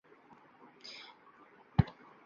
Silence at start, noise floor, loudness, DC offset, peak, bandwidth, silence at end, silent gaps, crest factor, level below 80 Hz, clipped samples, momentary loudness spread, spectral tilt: 1.8 s; -61 dBFS; -36 LUFS; under 0.1%; -12 dBFS; 7.2 kHz; 0.4 s; none; 28 dB; -52 dBFS; under 0.1%; 25 LU; -7 dB/octave